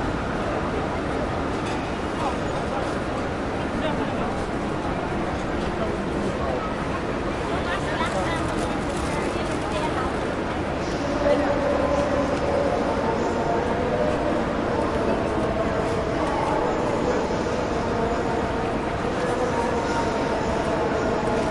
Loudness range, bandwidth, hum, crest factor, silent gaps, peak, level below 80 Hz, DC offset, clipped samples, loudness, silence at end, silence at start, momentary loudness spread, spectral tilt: 3 LU; 11.5 kHz; none; 14 dB; none; -10 dBFS; -38 dBFS; under 0.1%; under 0.1%; -25 LUFS; 0 s; 0 s; 4 LU; -6 dB/octave